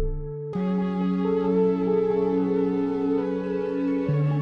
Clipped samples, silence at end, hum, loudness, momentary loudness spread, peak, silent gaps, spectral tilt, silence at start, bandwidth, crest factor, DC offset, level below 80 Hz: under 0.1%; 0 s; none; -25 LUFS; 5 LU; -12 dBFS; none; -10.5 dB/octave; 0 s; 5.8 kHz; 12 dB; under 0.1%; -40 dBFS